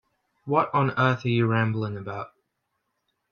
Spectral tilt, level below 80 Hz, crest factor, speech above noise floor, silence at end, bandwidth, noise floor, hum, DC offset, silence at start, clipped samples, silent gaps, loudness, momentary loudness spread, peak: -8 dB/octave; -66 dBFS; 20 dB; 54 dB; 1.05 s; 6.6 kHz; -78 dBFS; none; under 0.1%; 0.45 s; under 0.1%; none; -24 LUFS; 15 LU; -6 dBFS